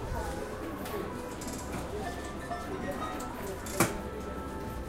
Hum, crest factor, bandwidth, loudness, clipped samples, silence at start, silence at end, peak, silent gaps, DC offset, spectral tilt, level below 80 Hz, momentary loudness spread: none; 26 dB; 16.5 kHz; -36 LUFS; under 0.1%; 0 s; 0 s; -10 dBFS; none; under 0.1%; -4.5 dB/octave; -46 dBFS; 9 LU